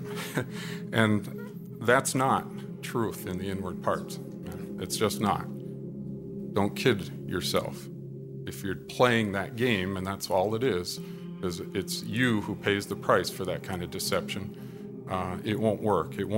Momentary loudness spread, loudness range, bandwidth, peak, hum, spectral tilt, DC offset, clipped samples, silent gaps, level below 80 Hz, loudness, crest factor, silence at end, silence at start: 14 LU; 3 LU; 16 kHz; -6 dBFS; none; -5 dB/octave; under 0.1%; under 0.1%; none; -60 dBFS; -30 LUFS; 24 dB; 0 s; 0 s